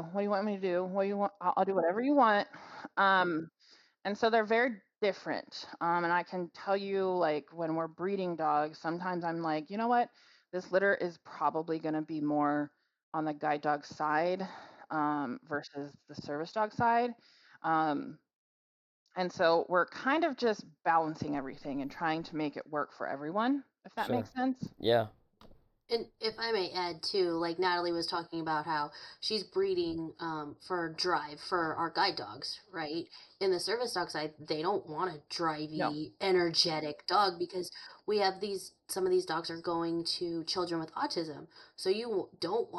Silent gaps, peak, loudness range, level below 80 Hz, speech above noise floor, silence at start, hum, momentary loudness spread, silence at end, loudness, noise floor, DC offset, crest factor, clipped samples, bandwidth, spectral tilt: 13.03-13.12 s, 18.35-19.06 s; -14 dBFS; 4 LU; -74 dBFS; 27 dB; 0 s; none; 10 LU; 0 s; -33 LUFS; -59 dBFS; under 0.1%; 20 dB; under 0.1%; 12 kHz; -4.5 dB/octave